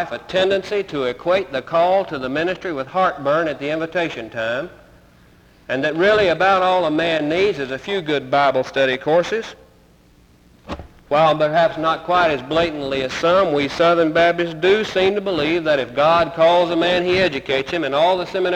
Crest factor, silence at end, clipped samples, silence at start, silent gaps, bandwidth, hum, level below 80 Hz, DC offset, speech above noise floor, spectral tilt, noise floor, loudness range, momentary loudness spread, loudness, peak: 14 dB; 0 s; under 0.1%; 0 s; none; 10.5 kHz; none; -50 dBFS; under 0.1%; 33 dB; -5.5 dB/octave; -51 dBFS; 5 LU; 9 LU; -18 LUFS; -6 dBFS